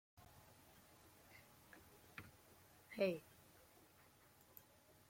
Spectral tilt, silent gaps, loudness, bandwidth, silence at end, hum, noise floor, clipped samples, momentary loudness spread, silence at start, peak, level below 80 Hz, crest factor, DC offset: -5.5 dB/octave; none; -47 LUFS; 16.5 kHz; 0.05 s; none; -70 dBFS; under 0.1%; 25 LU; 0.15 s; -26 dBFS; -82 dBFS; 26 dB; under 0.1%